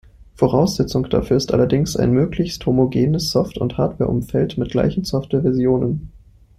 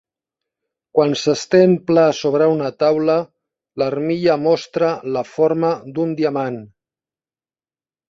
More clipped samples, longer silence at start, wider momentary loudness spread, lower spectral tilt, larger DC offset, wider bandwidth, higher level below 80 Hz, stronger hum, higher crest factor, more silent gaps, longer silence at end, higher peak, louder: neither; second, 0.4 s vs 0.95 s; second, 4 LU vs 9 LU; about the same, -7 dB/octave vs -6 dB/octave; neither; first, 15.5 kHz vs 7.8 kHz; first, -38 dBFS vs -62 dBFS; neither; about the same, 16 dB vs 16 dB; neither; second, 0.4 s vs 1.45 s; about the same, -2 dBFS vs -2 dBFS; about the same, -19 LUFS vs -17 LUFS